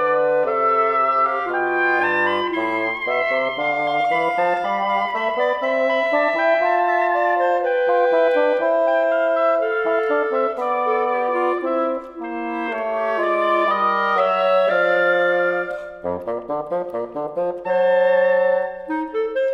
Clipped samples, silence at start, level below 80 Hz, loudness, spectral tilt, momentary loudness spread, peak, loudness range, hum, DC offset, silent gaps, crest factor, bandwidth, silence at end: under 0.1%; 0 s; -60 dBFS; -19 LUFS; -5.5 dB/octave; 8 LU; -6 dBFS; 3 LU; none; under 0.1%; none; 14 dB; 6.8 kHz; 0 s